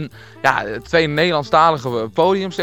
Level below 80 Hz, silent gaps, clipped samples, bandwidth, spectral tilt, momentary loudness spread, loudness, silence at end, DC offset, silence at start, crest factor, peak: -48 dBFS; none; under 0.1%; 17.5 kHz; -5.5 dB/octave; 8 LU; -17 LUFS; 0 s; 0.2%; 0 s; 18 dB; 0 dBFS